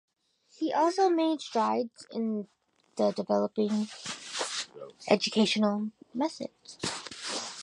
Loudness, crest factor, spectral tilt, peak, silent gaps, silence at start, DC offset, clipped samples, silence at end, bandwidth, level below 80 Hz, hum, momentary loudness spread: -30 LUFS; 22 dB; -4 dB/octave; -8 dBFS; none; 0.6 s; under 0.1%; under 0.1%; 0 s; 11.5 kHz; -76 dBFS; none; 12 LU